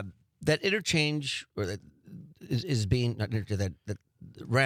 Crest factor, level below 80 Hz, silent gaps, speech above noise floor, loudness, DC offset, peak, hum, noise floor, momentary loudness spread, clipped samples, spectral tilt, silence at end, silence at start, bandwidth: 20 dB; -56 dBFS; none; 20 dB; -30 LUFS; under 0.1%; -12 dBFS; none; -49 dBFS; 20 LU; under 0.1%; -5 dB/octave; 0 s; 0 s; 15 kHz